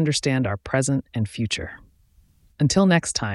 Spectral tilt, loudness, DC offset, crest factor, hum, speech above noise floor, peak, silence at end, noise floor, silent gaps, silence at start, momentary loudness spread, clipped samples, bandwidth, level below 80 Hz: -5 dB/octave; -22 LUFS; under 0.1%; 18 dB; none; 36 dB; -4 dBFS; 0 s; -58 dBFS; none; 0 s; 10 LU; under 0.1%; 12 kHz; -48 dBFS